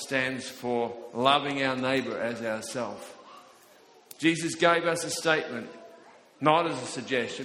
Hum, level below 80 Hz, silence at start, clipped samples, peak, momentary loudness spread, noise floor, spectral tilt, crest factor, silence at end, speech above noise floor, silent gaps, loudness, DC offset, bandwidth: none; -70 dBFS; 0 s; under 0.1%; -6 dBFS; 12 LU; -56 dBFS; -3.5 dB/octave; 22 dB; 0 s; 29 dB; none; -28 LUFS; under 0.1%; 16 kHz